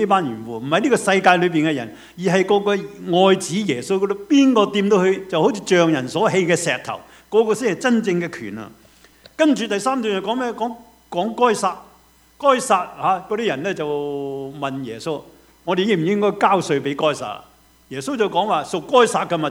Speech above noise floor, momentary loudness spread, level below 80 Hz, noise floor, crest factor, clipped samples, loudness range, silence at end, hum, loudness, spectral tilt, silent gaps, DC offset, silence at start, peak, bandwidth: 34 dB; 13 LU; -60 dBFS; -53 dBFS; 20 dB; under 0.1%; 4 LU; 0 s; none; -19 LUFS; -5 dB/octave; none; under 0.1%; 0 s; 0 dBFS; 16.5 kHz